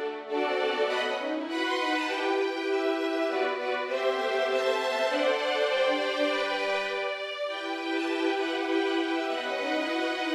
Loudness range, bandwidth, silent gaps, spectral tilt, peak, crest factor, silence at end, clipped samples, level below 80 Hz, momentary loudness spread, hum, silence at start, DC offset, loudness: 2 LU; 13.5 kHz; none; -2 dB/octave; -14 dBFS; 14 dB; 0 s; under 0.1%; -86 dBFS; 5 LU; none; 0 s; under 0.1%; -28 LUFS